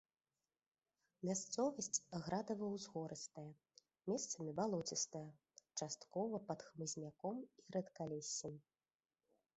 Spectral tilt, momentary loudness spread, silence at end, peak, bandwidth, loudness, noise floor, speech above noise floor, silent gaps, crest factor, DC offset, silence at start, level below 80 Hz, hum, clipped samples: -4 dB/octave; 11 LU; 0.95 s; -24 dBFS; 8.2 kHz; -45 LUFS; under -90 dBFS; over 45 dB; none; 22 dB; under 0.1%; 1.2 s; -82 dBFS; none; under 0.1%